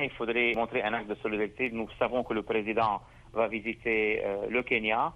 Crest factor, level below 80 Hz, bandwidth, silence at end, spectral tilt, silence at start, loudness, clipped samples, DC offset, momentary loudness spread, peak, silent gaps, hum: 18 dB; -56 dBFS; 8.6 kHz; 0 s; -6.5 dB/octave; 0 s; -30 LUFS; under 0.1%; under 0.1%; 6 LU; -12 dBFS; none; none